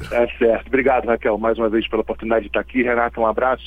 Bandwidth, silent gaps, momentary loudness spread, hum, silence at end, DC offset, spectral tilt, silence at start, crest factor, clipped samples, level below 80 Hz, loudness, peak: 9.8 kHz; none; 4 LU; none; 0 s; under 0.1%; -7 dB/octave; 0 s; 16 dB; under 0.1%; -40 dBFS; -19 LUFS; -2 dBFS